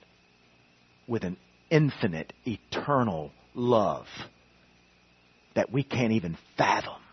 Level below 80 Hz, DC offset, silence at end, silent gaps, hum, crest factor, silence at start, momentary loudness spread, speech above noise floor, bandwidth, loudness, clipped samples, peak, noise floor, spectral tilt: -64 dBFS; under 0.1%; 0.15 s; none; 60 Hz at -55 dBFS; 22 dB; 1.1 s; 13 LU; 34 dB; 6.4 kHz; -29 LUFS; under 0.1%; -8 dBFS; -62 dBFS; -6.5 dB/octave